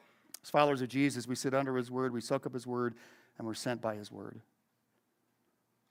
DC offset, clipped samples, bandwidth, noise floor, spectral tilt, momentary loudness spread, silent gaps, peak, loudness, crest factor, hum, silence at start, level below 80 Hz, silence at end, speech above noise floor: under 0.1%; under 0.1%; 16.5 kHz; -78 dBFS; -5 dB/octave; 17 LU; none; -12 dBFS; -34 LUFS; 24 dB; none; 0.45 s; -80 dBFS; 1.5 s; 44 dB